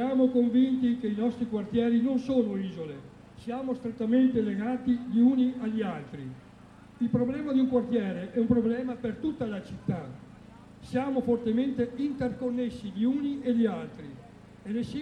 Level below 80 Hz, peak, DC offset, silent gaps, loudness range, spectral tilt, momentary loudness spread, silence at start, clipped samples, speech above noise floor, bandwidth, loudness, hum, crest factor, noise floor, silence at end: -58 dBFS; -10 dBFS; under 0.1%; none; 3 LU; -8.5 dB/octave; 16 LU; 0 s; under 0.1%; 24 dB; 6.4 kHz; -28 LUFS; none; 18 dB; -51 dBFS; 0 s